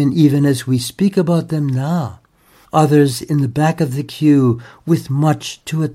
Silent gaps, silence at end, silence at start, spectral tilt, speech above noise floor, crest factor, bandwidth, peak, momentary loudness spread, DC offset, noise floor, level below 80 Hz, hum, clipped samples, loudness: none; 0 s; 0 s; -7 dB/octave; 36 dB; 14 dB; 15.5 kHz; -2 dBFS; 8 LU; under 0.1%; -51 dBFS; -52 dBFS; none; under 0.1%; -16 LUFS